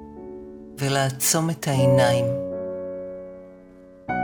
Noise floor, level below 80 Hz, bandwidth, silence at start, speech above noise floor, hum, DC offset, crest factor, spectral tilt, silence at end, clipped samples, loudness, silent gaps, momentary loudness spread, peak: -47 dBFS; -56 dBFS; 18 kHz; 0 s; 26 dB; none; under 0.1%; 20 dB; -4.5 dB/octave; 0 s; under 0.1%; -22 LUFS; none; 22 LU; -6 dBFS